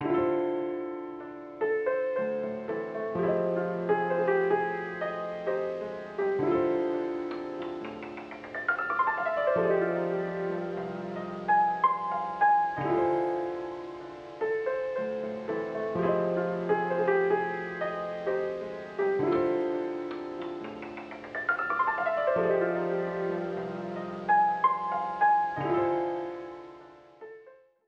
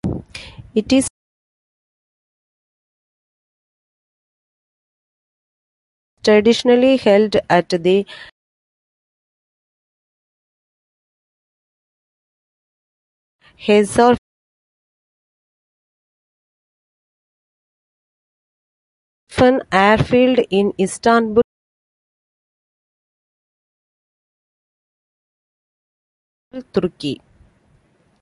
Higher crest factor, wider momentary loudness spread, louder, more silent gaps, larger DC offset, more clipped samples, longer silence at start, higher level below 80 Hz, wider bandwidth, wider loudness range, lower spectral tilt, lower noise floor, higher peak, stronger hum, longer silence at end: about the same, 18 dB vs 20 dB; about the same, 13 LU vs 14 LU; second, -29 LUFS vs -16 LUFS; second, none vs 1.10-6.17 s, 8.32-13.39 s, 14.18-19.27 s, 21.44-26.51 s; neither; neither; about the same, 0 s vs 0.05 s; second, -66 dBFS vs -48 dBFS; second, 7 kHz vs 11.5 kHz; second, 4 LU vs 13 LU; first, -8 dB/octave vs -5 dB/octave; about the same, -55 dBFS vs -58 dBFS; second, -12 dBFS vs -2 dBFS; neither; second, 0.3 s vs 1.05 s